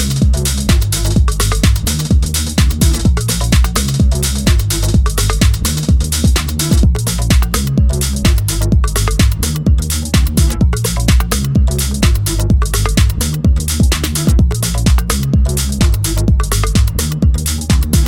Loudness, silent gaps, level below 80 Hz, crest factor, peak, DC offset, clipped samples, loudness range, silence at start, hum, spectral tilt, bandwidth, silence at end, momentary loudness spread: -14 LUFS; none; -14 dBFS; 12 dB; 0 dBFS; 0.3%; under 0.1%; 1 LU; 0 s; none; -4.5 dB/octave; 17.5 kHz; 0 s; 2 LU